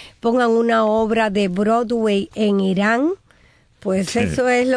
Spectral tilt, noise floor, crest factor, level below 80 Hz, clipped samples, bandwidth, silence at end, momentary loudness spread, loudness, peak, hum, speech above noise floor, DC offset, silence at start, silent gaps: -6 dB/octave; -54 dBFS; 12 dB; -48 dBFS; under 0.1%; 11 kHz; 0 s; 6 LU; -18 LUFS; -6 dBFS; none; 37 dB; under 0.1%; 0 s; none